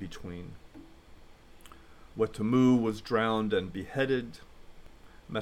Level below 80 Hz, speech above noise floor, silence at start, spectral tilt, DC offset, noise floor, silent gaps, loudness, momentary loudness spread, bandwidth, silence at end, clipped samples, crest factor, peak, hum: -54 dBFS; 23 dB; 0 s; -7 dB/octave; under 0.1%; -53 dBFS; none; -29 LUFS; 21 LU; 11 kHz; 0 s; under 0.1%; 18 dB; -14 dBFS; none